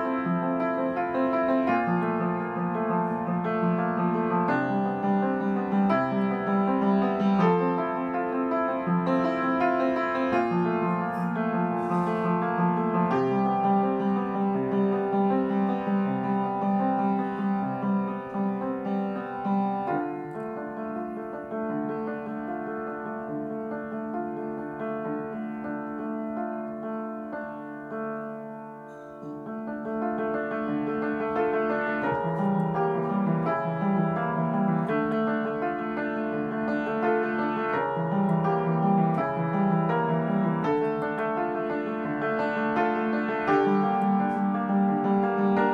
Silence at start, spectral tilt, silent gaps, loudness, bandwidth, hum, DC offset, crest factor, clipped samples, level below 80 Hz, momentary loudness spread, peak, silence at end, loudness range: 0 s; -9.5 dB/octave; none; -27 LUFS; 6 kHz; none; under 0.1%; 16 dB; under 0.1%; -64 dBFS; 9 LU; -10 dBFS; 0 s; 8 LU